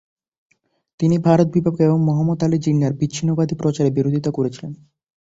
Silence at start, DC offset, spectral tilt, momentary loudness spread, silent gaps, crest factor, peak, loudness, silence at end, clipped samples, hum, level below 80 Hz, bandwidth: 1 s; under 0.1%; -8 dB/octave; 7 LU; none; 18 dB; -2 dBFS; -19 LUFS; 0.45 s; under 0.1%; none; -52 dBFS; 7.8 kHz